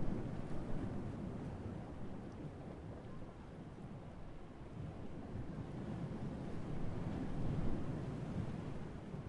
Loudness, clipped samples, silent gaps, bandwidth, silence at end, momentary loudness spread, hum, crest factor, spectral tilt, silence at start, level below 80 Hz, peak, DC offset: -46 LUFS; under 0.1%; none; 10.5 kHz; 0 s; 10 LU; none; 18 dB; -8.5 dB/octave; 0 s; -52 dBFS; -24 dBFS; under 0.1%